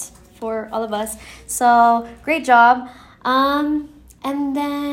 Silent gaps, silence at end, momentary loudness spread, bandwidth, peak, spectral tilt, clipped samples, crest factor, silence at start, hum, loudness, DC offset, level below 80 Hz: none; 0 s; 17 LU; 16.5 kHz; -2 dBFS; -3 dB/octave; under 0.1%; 18 dB; 0 s; none; -18 LUFS; under 0.1%; -50 dBFS